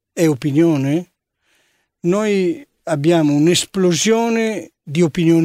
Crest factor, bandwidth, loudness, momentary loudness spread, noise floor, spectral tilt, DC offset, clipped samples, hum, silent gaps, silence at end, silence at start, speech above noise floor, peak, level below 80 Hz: 14 dB; 15.5 kHz; -17 LUFS; 9 LU; -64 dBFS; -5.5 dB/octave; under 0.1%; under 0.1%; none; none; 0 s; 0.15 s; 48 dB; -2 dBFS; -56 dBFS